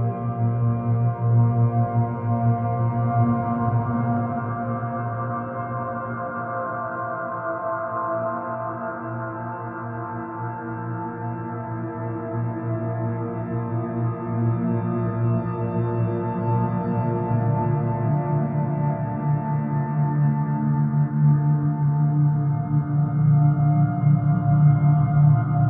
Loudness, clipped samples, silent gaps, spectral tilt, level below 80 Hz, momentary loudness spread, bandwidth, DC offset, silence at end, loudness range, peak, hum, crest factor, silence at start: -23 LUFS; under 0.1%; none; -14 dB/octave; -52 dBFS; 11 LU; 2.8 kHz; under 0.1%; 0 s; 9 LU; -8 dBFS; none; 14 dB; 0 s